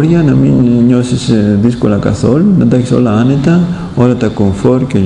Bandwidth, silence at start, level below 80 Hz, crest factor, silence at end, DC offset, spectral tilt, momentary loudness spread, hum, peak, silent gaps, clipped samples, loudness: 10.5 kHz; 0 s; -34 dBFS; 8 dB; 0 s; under 0.1%; -8 dB/octave; 4 LU; none; 0 dBFS; none; 1%; -10 LUFS